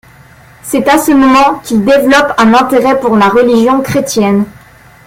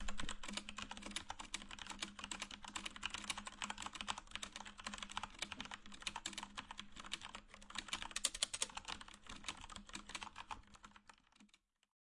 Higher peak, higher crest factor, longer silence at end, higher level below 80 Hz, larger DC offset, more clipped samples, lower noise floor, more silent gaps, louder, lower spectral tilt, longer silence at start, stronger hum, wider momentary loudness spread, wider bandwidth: first, 0 dBFS vs -18 dBFS; second, 8 dB vs 32 dB; about the same, 0.6 s vs 0.55 s; first, -40 dBFS vs -62 dBFS; neither; neither; second, -38 dBFS vs -73 dBFS; neither; first, -8 LUFS vs -47 LUFS; first, -5 dB/octave vs -0.5 dB/octave; first, 0.65 s vs 0 s; neither; second, 6 LU vs 11 LU; first, 17 kHz vs 11.5 kHz